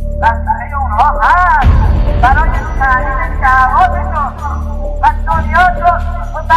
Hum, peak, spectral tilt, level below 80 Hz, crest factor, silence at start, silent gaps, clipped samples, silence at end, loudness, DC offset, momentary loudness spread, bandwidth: none; 0 dBFS; -7 dB/octave; -14 dBFS; 10 dB; 0 s; none; under 0.1%; 0 s; -12 LUFS; under 0.1%; 9 LU; 8.4 kHz